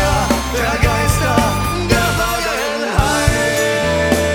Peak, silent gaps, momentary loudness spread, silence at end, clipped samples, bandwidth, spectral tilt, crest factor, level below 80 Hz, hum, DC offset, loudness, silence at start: 0 dBFS; none; 3 LU; 0 s; under 0.1%; 19 kHz; -4.5 dB/octave; 16 dB; -24 dBFS; none; under 0.1%; -16 LUFS; 0 s